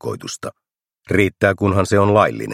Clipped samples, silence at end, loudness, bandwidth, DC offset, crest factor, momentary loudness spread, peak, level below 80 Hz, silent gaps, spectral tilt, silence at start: under 0.1%; 0 s; -17 LUFS; 14.5 kHz; under 0.1%; 18 dB; 15 LU; 0 dBFS; -50 dBFS; none; -6 dB/octave; 0.05 s